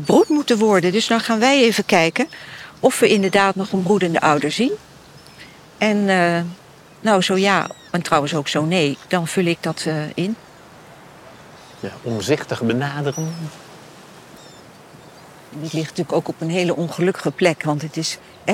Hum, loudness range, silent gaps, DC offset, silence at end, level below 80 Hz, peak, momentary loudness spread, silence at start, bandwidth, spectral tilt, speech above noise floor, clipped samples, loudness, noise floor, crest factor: none; 9 LU; none; under 0.1%; 0 s; -60 dBFS; -2 dBFS; 12 LU; 0 s; 16.5 kHz; -5 dB/octave; 25 dB; under 0.1%; -19 LUFS; -44 dBFS; 18 dB